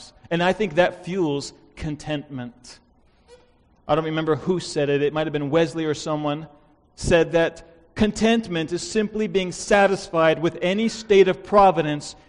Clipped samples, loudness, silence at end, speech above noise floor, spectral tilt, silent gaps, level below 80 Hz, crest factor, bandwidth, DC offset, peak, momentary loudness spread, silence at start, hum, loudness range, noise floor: under 0.1%; -22 LUFS; 0.15 s; 36 dB; -5.5 dB/octave; none; -46 dBFS; 20 dB; 10.5 kHz; under 0.1%; -2 dBFS; 14 LU; 0 s; none; 8 LU; -57 dBFS